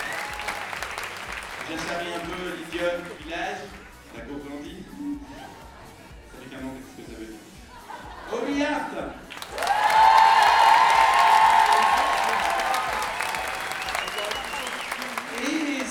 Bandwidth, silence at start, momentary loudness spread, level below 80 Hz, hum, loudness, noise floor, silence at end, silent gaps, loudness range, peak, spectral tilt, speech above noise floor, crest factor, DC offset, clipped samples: 18 kHz; 0 s; 24 LU; -52 dBFS; none; -22 LUFS; -45 dBFS; 0 s; none; 21 LU; -6 dBFS; -2.5 dB/octave; 13 dB; 18 dB; under 0.1%; under 0.1%